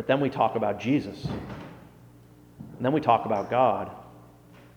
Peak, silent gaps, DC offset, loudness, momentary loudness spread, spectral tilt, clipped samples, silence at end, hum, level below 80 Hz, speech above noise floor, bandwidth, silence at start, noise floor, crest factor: -6 dBFS; none; under 0.1%; -26 LUFS; 21 LU; -7.5 dB/octave; under 0.1%; 0.15 s; 60 Hz at -50 dBFS; -56 dBFS; 27 dB; 20 kHz; 0 s; -52 dBFS; 22 dB